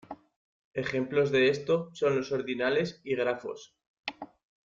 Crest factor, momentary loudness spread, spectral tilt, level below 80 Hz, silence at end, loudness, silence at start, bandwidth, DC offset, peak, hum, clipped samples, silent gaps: 16 dB; 21 LU; -5.5 dB/octave; -68 dBFS; 0.4 s; -29 LUFS; 0.1 s; 7.6 kHz; under 0.1%; -14 dBFS; none; under 0.1%; 0.36-0.72 s, 3.87-4.03 s